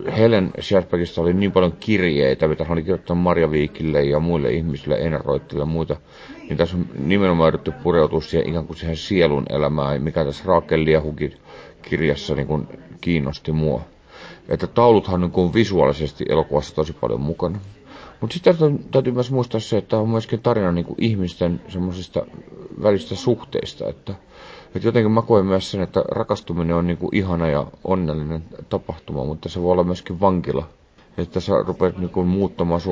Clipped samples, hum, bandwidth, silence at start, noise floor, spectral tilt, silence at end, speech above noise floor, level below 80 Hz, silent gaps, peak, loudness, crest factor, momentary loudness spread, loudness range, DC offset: under 0.1%; none; 8 kHz; 0 s; -42 dBFS; -7.5 dB/octave; 0 s; 22 dB; -38 dBFS; none; -2 dBFS; -20 LUFS; 18 dB; 11 LU; 4 LU; under 0.1%